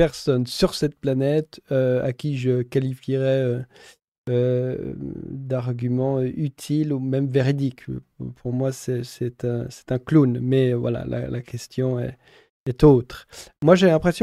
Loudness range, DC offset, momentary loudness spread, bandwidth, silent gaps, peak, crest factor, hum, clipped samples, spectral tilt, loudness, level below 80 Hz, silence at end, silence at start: 4 LU; under 0.1%; 15 LU; 13.5 kHz; 4.04-4.12 s, 4.18-4.24 s, 12.50-12.66 s; -2 dBFS; 20 dB; none; under 0.1%; -7.5 dB/octave; -22 LUFS; -46 dBFS; 0 s; 0 s